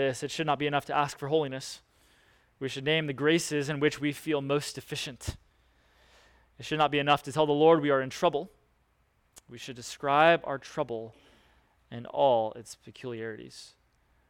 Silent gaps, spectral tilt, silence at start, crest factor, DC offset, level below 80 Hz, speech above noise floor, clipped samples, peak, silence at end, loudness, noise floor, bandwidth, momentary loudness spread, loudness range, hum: none; -4.5 dB/octave; 0 s; 22 dB; under 0.1%; -60 dBFS; 41 dB; under 0.1%; -8 dBFS; 0.65 s; -28 LUFS; -70 dBFS; 18 kHz; 21 LU; 5 LU; none